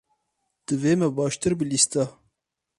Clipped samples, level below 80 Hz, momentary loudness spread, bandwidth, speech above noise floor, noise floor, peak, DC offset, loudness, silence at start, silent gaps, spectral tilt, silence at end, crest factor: under 0.1%; -58 dBFS; 10 LU; 11.5 kHz; 57 dB; -80 dBFS; -6 dBFS; under 0.1%; -23 LUFS; 0.7 s; none; -4.5 dB/octave; 0.7 s; 20 dB